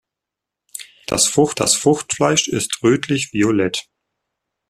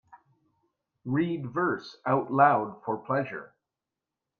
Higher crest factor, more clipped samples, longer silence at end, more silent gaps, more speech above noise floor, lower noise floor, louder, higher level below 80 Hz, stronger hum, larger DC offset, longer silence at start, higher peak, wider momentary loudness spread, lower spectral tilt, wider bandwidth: about the same, 18 dB vs 22 dB; neither; about the same, 0.9 s vs 0.95 s; neither; first, 67 dB vs 61 dB; second, -84 dBFS vs -88 dBFS; first, -17 LUFS vs -28 LUFS; first, -52 dBFS vs -72 dBFS; neither; neither; second, 0.75 s vs 1.05 s; first, 0 dBFS vs -8 dBFS; about the same, 15 LU vs 14 LU; second, -3.5 dB/octave vs -8.5 dB/octave; first, 14.5 kHz vs 6.6 kHz